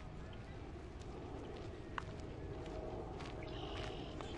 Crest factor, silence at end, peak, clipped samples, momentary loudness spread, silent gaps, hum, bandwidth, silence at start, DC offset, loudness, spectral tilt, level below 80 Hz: 24 dB; 0 s; -24 dBFS; under 0.1%; 5 LU; none; none; 11 kHz; 0 s; under 0.1%; -48 LUFS; -6 dB/octave; -54 dBFS